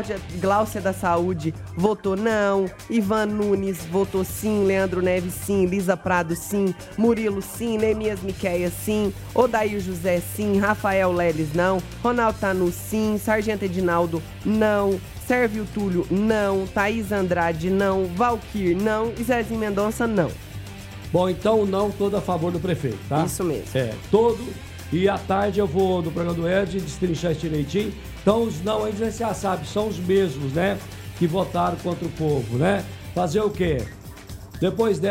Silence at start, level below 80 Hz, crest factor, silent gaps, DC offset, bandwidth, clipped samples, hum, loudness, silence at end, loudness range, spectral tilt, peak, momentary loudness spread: 0 s; -42 dBFS; 18 dB; none; under 0.1%; 16 kHz; under 0.1%; none; -23 LUFS; 0 s; 2 LU; -6 dB/octave; -6 dBFS; 6 LU